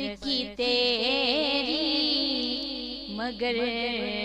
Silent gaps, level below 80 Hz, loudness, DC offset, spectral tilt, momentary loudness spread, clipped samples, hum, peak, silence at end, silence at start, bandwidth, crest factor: none; -54 dBFS; -26 LUFS; under 0.1%; -3.5 dB/octave; 9 LU; under 0.1%; 50 Hz at -55 dBFS; -10 dBFS; 0 s; 0 s; 11 kHz; 18 dB